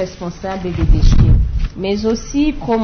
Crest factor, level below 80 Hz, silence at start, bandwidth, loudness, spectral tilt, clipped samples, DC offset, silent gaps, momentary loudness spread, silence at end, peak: 12 dB; -16 dBFS; 0 s; 6.6 kHz; -17 LUFS; -7 dB/octave; under 0.1%; under 0.1%; none; 11 LU; 0 s; 0 dBFS